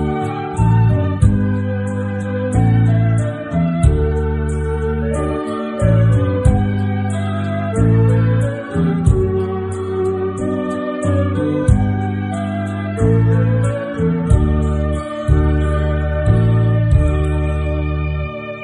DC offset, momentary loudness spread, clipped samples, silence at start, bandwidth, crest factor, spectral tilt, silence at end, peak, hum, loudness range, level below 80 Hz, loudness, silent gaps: under 0.1%; 7 LU; under 0.1%; 0 s; 10.5 kHz; 14 dB; -8.5 dB/octave; 0 s; 0 dBFS; none; 2 LU; -22 dBFS; -17 LUFS; none